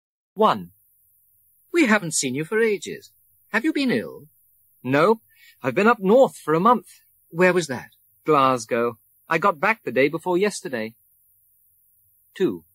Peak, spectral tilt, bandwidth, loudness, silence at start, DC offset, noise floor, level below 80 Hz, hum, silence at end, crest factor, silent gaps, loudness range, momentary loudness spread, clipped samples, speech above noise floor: -4 dBFS; -4.5 dB/octave; 16 kHz; -21 LUFS; 0.35 s; under 0.1%; -61 dBFS; -70 dBFS; none; 0.15 s; 18 dB; none; 4 LU; 12 LU; under 0.1%; 40 dB